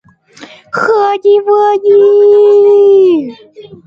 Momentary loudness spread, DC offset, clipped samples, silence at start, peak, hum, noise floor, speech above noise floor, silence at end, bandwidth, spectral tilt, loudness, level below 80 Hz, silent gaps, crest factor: 9 LU; under 0.1%; under 0.1%; 0.4 s; 0 dBFS; none; -36 dBFS; 29 dB; 0.1 s; 7 kHz; -6 dB/octave; -7 LUFS; -62 dBFS; none; 8 dB